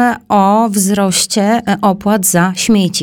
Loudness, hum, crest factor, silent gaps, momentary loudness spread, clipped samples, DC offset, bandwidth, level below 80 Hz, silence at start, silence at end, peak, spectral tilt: -12 LUFS; none; 10 dB; none; 2 LU; under 0.1%; under 0.1%; 18.5 kHz; -46 dBFS; 0 s; 0 s; 0 dBFS; -4 dB/octave